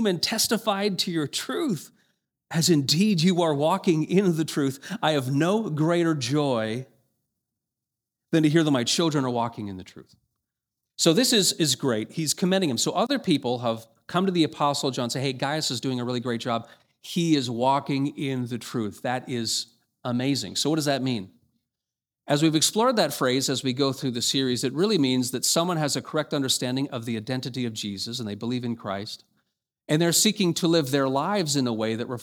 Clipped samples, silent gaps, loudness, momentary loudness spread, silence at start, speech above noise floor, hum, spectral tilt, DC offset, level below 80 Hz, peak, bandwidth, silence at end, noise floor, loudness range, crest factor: under 0.1%; none; -24 LUFS; 10 LU; 0 s; 64 dB; none; -4 dB/octave; under 0.1%; -70 dBFS; -6 dBFS; 20 kHz; 0 s; -89 dBFS; 4 LU; 20 dB